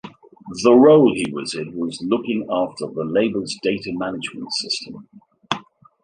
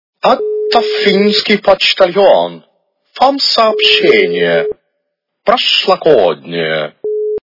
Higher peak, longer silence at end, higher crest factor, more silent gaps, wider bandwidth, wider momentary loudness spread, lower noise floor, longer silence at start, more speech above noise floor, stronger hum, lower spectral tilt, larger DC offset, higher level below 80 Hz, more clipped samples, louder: about the same, -2 dBFS vs 0 dBFS; first, 0.45 s vs 0.05 s; first, 18 dB vs 12 dB; neither; first, 10 kHz vs 6 kHz; first, 15 LU vs 10 LU; second, -39 dBFS vs -71 dBFS; second, 0.05 s vs 0.25 s; second, 20 dB vs 60 dB; neither; about the same, -5 dB/octave vs -4.5 dB/octave; neither; second, -60 dBFS vs -52 dBFS; second, under 0.1% vs 0.5%; second, -20 LUFS vs -11 LUFS